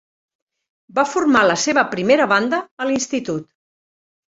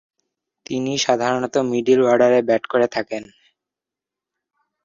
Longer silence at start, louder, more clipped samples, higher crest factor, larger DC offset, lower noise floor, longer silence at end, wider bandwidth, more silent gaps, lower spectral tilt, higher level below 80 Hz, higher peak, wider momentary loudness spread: first, 0.95 s vs 0.7 s; about the same, -18 LUFS vs -18 LUFS; neither; about the same, 18 dB vs 18 dB; neither; about the same, under -90 dBFS vs -87 dBFS; second, 0.9 s vs 1.6 s; about the same, 8 kHz vs 7.6 kHz; first, 2.71-2.77 s vs none; about the same, -3.5 dB/octave vs -4.5 dB/octave; about the same, -60 dBFS vs -64 dBFS; about the same, -2 dBFS vs -4 dBFS; about the same, 10 LU vs 12 LU